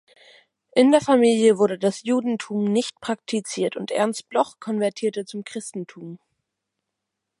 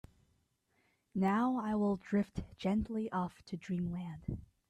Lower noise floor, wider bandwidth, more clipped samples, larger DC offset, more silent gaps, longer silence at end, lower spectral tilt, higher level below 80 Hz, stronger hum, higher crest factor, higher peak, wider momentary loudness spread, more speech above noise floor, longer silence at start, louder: first, -82 dBFS vs -77 dBFS; first, 11.5 kHz vs 9.6 kHz; neither; neither; neither; first, 1.25 s vs 0.25 s; second, -5 dB/octave vs -8 dB/octave; second, -72 dBFS vs -58 dBFS; neither; about the same, 20 dB vs 16 dB; first, -4 dBFS vs -20 dBFS; first, 15 LU vs 11 LU; first, 61 dB vs 42 dB; second, 0.75 s vs 1.15 s; first, -22 LUFS vs -36 LUFS